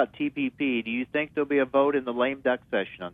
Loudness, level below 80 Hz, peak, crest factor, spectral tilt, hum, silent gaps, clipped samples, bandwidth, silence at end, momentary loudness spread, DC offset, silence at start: -27 LUFS; -64 dBFS; -10 dBFS; 16 dB; -8 dB/octave; none; none; under 0.1%; 3.9 kHz; 0.05 s; 6 LU; under 0.1%; 0 s